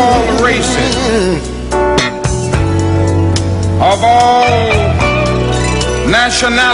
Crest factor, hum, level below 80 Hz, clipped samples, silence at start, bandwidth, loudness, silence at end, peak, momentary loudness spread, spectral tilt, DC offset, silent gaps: 10 dB; none; -24 dBFS; under 0.1%; 0 s; 11 kHz; -11 LUFS; 0 s; -2 dBFS; 6 LU; -4.5 dB/octave; under 0.1%; none